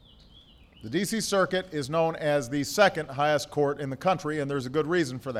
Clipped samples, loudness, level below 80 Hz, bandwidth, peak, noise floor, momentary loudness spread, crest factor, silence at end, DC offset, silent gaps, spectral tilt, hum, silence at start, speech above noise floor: under 0.1%; -27 LUFS; -60 dBFS; 16 kHz; -6 dBFS; -54 dBFS; 7 LU; 20 dB; 0 s; under 0.1%; none; -4.5 dB/octave; none; 0.35 s; 27 dB